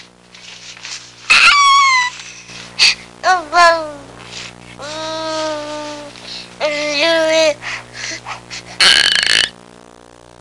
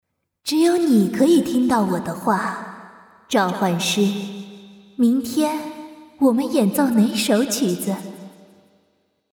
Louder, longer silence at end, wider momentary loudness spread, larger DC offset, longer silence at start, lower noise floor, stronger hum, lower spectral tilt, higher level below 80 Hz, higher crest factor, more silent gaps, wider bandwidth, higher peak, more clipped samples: first, -12 LUFS vs -19 LUFS; second, 0.9 s vs 1.05 s; first, 22 LU vs 18 LU; neither; about the same, 0.45 s vs 0.45 s; second, -42 dBFS vs -66 dBFS; first, 60 Hz at -45 dBFS vs none; second, -0.5 dB/octave vs -5 dB/octave; first, -52 dBFS vs -64 dBFS; about the same, 16 dB vs 16 dB; neither; second, 11.5 kHz vs 19 kHz; first, 0 dBFS vs -4 dBFS; neither